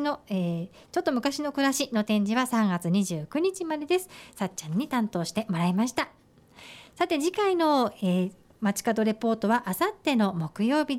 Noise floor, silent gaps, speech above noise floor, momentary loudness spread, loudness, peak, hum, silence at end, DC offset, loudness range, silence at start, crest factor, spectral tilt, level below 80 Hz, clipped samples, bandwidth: -51 dBFS; none; 25 dB; 8 LU; -27 LUFS; -12 dBFS; none; 0 s; under 0.1%; 3 LU; 0 s; 14 dB; -5 dB/octave; -66 dBFS; under 0.1%; 16.5 kHz